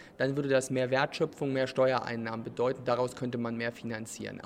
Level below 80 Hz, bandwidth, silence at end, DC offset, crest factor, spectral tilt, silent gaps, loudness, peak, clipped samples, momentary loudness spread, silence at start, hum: -68 dBFS; 15 kHz; 0 s; under 0.1%; 20 dB; -5.5 dB/octave; none; -31 LUFS; -12 dBFS; under 0.1%; 9 LU; 0 s; none